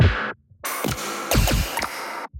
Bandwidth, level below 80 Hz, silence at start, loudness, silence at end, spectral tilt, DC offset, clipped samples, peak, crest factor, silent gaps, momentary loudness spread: 17 kHz; -30 dBFS; 0 s; -24 LUFS; 0 s; -4 dB/octave; under 0.1%; under 0.1%; -4 dBFS; 18 dB; none; 10 LU